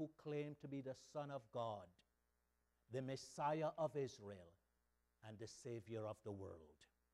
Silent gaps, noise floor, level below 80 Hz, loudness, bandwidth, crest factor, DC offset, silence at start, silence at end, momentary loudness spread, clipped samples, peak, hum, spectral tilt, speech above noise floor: none; -86 dBFS; -82 dBFS; -49 LUFS; 13 kHz; 20 dB; under 0.1%; 0 s; 0.3 s; 16 LU; under 0.1%; -30 dBFS; 60 Hz at -85 dBFS; -6 dB/octave; 37 dB